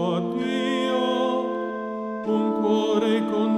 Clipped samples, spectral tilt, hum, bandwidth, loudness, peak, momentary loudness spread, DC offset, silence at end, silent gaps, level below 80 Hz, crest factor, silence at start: under 0.1%; -6 dB/octave; none; 11.5 kHz; -24 LUFS; -10 dBFS; 8 LU; under 0.1%; 0 s; none; -68 dBFS; 14 dB; 0 s